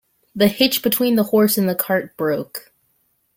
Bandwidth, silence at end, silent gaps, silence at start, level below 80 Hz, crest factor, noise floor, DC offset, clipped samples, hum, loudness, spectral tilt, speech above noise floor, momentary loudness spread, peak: 17 kHz; 0.8 s; none; 0.35 s; -58 dBFS; 18 dB; -65 dBFS; under 0.1%; under 0.1%; none; -18 LUFS; -4.5 dB/octave; 47 dB; 13 LU; 0 dBFS